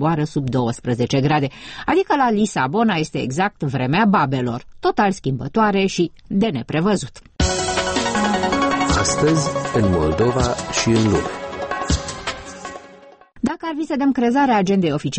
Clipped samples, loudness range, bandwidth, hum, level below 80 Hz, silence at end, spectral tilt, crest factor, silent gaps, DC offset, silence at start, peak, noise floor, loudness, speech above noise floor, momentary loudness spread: under 0.1%; 4 LU; 8.8 kHz; none; -36 dBFS; 0 s; -5 dB/octave; 14 dB; none; under 0.1%; 0 s; -6 dBFS; -45 dBFS; -19 LUFS; 26 dB; 9 LU